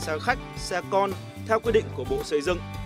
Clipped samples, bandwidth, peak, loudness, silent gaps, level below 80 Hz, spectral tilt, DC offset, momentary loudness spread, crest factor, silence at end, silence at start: under 0.1%; 16 kHz; -8 dBFS; -27 LUFS; none; -44 dBFS; -5 dB/octave; under 0.1%; 7 LU; 20 dB; 0 s; 0 s